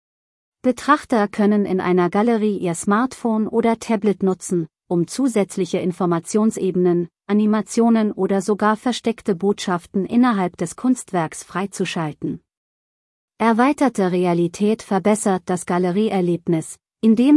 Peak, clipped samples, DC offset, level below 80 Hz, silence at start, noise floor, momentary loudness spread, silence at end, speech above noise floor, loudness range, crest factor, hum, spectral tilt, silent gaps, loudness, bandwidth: -2 dBFS; under 0.1%; under 0.1%; -62 dBFS; 0.65 s; under -90 dBFS; 7 LU; 0 s; over 71 dB; 3 LU; 16 dB; none; -6 dB/octave; 12.57-13.28 s; -20 LUFS; 12 kHz